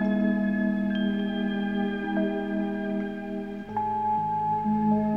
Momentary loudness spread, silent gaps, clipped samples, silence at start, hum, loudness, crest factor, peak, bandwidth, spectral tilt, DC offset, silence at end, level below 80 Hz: 7 LU; none; under 0.1%; 0 s; 50 Hz at -40 dBFS; -27 LUFS; 12 dB; -14 dBFS; 4.6 kHz; -9 dB/octave; 0.2%; 0 s; -58 dBFS